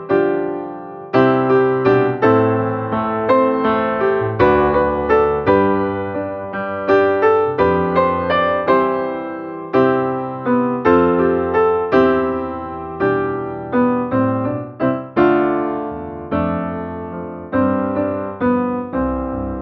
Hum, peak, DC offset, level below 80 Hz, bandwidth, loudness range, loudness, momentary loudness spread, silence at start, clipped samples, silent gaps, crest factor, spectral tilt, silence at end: none; -2 dBFS; under 0.1%; -42 dBFS; 5.6 kHz; 4 LU; -17 LUFS; 10 LU; 0 s; under 0.1%; none; 16 dB; -9.5 dB/octave; 0 s